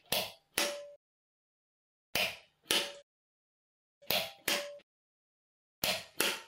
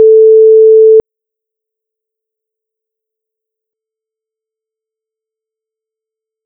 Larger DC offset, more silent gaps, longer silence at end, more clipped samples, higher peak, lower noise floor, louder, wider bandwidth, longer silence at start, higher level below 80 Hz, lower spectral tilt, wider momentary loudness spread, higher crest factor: neither; first, 0.96-2.13 s, 3.03-4.01 s, 4.83-5.82 s vs none; second, 0 s vs 5.45 s; neither; second, -10 dBFS vs 0 dBFS; first, under -90 dBFS vs -83 dBFS; second, -34 LUFS vs -4 LUFS; first, 16 kHz vs 1 kHz; about the same, 0.1 s vs 0 s; second, -72 dBFS vs -58 dBFS; second, -0.5 dB/octave vs -10.5 dB/octave; first, 15 LU vs 3 LU; first, 28 dB vs 12 dB